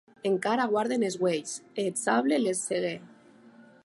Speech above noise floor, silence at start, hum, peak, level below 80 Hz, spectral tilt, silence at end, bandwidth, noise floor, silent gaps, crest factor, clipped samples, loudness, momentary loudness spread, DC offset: 27 dB; 0.25 s; none; -12 dBFS; -80 dBFS; -4 dB/octave; 0.25 s; 11.5 kHz; -54 dBFS; none; 18 dB; under 0.1%; -28 LUFS; 7 LU; under 0.1%